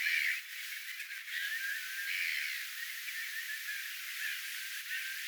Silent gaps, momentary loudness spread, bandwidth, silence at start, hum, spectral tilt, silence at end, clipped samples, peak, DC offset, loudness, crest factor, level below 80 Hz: none; 7 LU; over 20 kHz; 0 s; none; 11 dB/octave; 0 s; under 0.1%; -20 dBFS; under 0.1%; -37 LUFS; 20 dB; under -90 dBFS